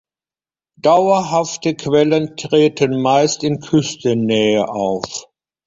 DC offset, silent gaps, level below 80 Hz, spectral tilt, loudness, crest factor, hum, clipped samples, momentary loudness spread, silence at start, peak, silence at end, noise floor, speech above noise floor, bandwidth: under 0.1%; none; -56 dBFS; -5 dB/octave; -16 LUFS; 14 dB; none; under 0.1%; 7 LU; 0.85 s; -2 dBFS; 0.45 s; under -90 dBFS; over 75 dB; 7.8 kHz